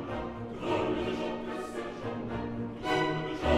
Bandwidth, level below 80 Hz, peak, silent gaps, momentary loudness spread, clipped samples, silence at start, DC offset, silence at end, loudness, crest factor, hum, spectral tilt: 13.5 kHz; -48 dBFS; -14 dBFS; none; 8 LU; under 0.1%; 0 s; under 0.1%; 0 s; -34 LUFS; 18 dB; none; -6 dB/octave